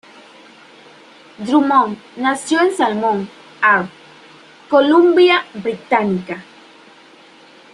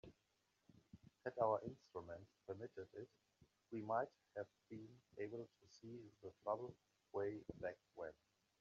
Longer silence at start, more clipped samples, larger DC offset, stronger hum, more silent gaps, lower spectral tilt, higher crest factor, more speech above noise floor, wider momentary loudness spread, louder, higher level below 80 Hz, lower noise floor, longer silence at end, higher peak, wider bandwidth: first, 1.4 s vs 0.05 s; neither; neither; neither; neither; about the same, -5 dB/octave vs -6 dB/octave; second, 16 dB vs 24 dB; second, 30 dB vs 36 dB; about the same, 15 LU vs 17 LU; first, -15 LUFS vs -49 LUFS; first, -66 dBFS vs -82 dBFS; second, -45 dBFS vs -85 dBFS; first, 1.3 s vs 0.5 s; first, -2 dBFS vs -26 dBFS; first, 11.5 kHz vs 7.4 kHz